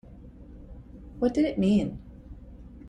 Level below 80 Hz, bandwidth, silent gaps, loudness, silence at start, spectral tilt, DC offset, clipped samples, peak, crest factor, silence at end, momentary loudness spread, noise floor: -46 dBFS; 9.4 kHz; none; -26 LUFS; 0.1 s; -8 dB/octave; under 0.1%; under 0.1%; -12 dBFS; 18 dB; 0 s; 24 LU; -47 dBFS